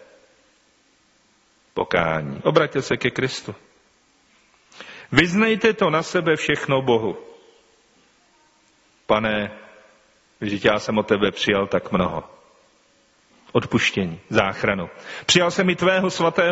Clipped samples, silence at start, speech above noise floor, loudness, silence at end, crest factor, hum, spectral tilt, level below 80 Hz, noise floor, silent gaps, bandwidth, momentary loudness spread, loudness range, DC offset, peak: under 0.1%; 1.75 s; 40 dB; -21 LUFS; 0 s; 22 dB; none; -3.5 dB/octave; -52 dBFS; -60 dBFS; none; 8 kHz; 13 LU; 5 LU; under 0.1%; 0 dBFS